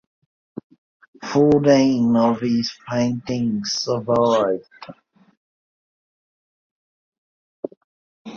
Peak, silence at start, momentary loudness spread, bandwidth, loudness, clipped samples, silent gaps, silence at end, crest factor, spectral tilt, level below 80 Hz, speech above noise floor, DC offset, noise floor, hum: -4 dBFS; 1.2 s; 22 LU; 7.2 kHz; -19 LUFS; under 0.1%; 5.37-7.12 s, 7.18-7.63 s, 7.77-8.25 s; 0 s; 18 dB; -6 dB/octave; -58 dBFS; over 71 dB; under 0.1%; under -90 dBFS; none